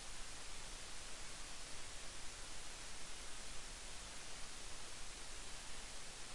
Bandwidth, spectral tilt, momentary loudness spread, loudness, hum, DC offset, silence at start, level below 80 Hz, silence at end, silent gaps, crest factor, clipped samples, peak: 11.5 kHz; -1 dB/octave; 0 LU; -51 LUFS; none; under 0.1%; 0 s; -56 dBFS; 0 s; none; 12 dB; under 0.1%; -34 dBFS